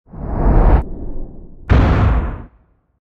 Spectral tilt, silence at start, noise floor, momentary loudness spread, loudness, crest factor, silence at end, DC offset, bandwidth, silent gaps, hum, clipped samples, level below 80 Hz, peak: -9.5 dB/octave; 0.15 s; -54 dBFS; 21 LU; -16 LUFS; 14 dB; 0.55 s; under 0.1%; 5.2 kHz; none; none; under 0.1%; -18 dBFS; 0 dBFS